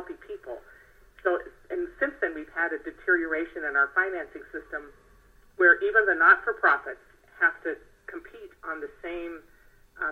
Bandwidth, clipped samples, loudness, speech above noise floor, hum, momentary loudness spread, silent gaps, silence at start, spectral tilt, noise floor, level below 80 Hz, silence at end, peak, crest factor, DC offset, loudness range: 6.6 kHz; under 0.1%; -25 LUFS; 31 dB; none; 22 LU; none; 0 s; -5.5 dB/octave; -57 dBFS; -58 dBFS; 0 s; -6 dBFS; 22 dB; under 0.1%; 7 LU